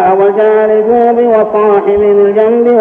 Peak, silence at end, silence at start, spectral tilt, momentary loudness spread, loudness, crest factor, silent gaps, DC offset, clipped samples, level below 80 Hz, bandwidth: 0 dBFS; 0 s; 0 s; -9 dB/octave; 1 LU; -8 LUFS; 8 dB; none; under 0.1%; under 0.1%; -46 dBFS; 3.6 kHz